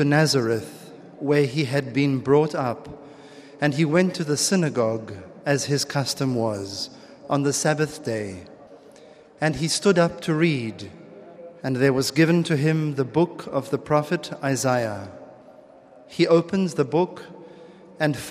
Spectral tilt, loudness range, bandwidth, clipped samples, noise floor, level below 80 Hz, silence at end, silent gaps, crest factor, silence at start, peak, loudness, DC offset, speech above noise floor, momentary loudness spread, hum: -5 dB/octave; 3 LU; 14.5 kHz; under 0.1%; -49 dBFS; -60 dBFS; 0 s; none; 18 dB; 0 s; -4 dBFS; -23 LUFS; under 0.1%; 26 dB; 18 LU; none